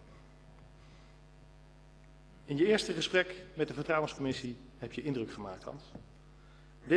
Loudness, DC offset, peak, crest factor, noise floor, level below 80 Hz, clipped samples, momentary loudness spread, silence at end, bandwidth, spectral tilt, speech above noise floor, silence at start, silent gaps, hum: -34 LUFS; under 0.1%; -14 dBFS; 22 dB; -57 dBFS; -60 dBFS; under 0.1%; 22 LU; 0 s; 11 kHz; -5 dB/octave; 23 dB; 0 s; none; none